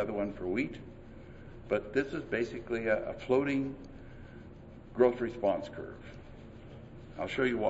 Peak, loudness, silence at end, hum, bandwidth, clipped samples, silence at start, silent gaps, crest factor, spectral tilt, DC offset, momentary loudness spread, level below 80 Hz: -12 dBFS; -33 LUFS; 0 s; none; 8 kHz; under 0.1%; 0 s; none; 22 dB; -7 dB/octave; under 0.1%; 21 LU; -54 dBFS